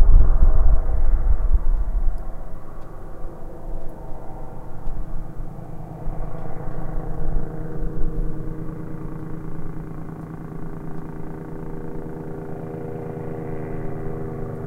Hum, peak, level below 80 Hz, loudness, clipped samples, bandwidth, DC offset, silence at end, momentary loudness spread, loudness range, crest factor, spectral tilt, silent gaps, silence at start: none; 0 dBFS; -22 dBFS; -30 LUFS; under 0.1%; 2.2 kHz; under 0.1%; 0 s; 14 LU; 9 LU; 18 dB; -10 dB/octave; none; 0 s